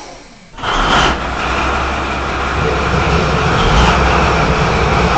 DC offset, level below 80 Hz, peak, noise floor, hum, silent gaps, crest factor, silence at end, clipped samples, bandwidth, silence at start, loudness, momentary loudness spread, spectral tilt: 1%; -20 dBFS; 0 dBFS; -35 dBFS; none; none; 14 dB; 0 s; under 0.1%; 8.8 kHz; 0 s; -14 LUFS; 7 LU; -5 dB/octave